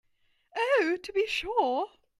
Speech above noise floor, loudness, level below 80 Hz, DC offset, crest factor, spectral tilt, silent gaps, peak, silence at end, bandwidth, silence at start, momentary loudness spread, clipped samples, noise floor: 40 dB; -28 LUFS; -62 dBFS; under 0.1%; 16 dB; -2.5 dB/octave; none; -12 dBFS; 0.35 s; 14 kHz; 0.55 s; 7 LU; under 0.1%; -69 dBFS